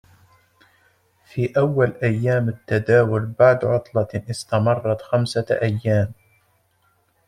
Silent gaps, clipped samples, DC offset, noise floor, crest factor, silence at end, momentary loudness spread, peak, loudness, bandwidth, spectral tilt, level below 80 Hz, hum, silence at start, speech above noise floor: none; under 0.1%; under 0.1%; -64 dBFS; 20 dB; 1.15 s; 8 LU; -2 dBFS; -20 LUFS; 11 kHz; -7 dB/octave; -56 dBFS; none; 1.35 s; 44 dB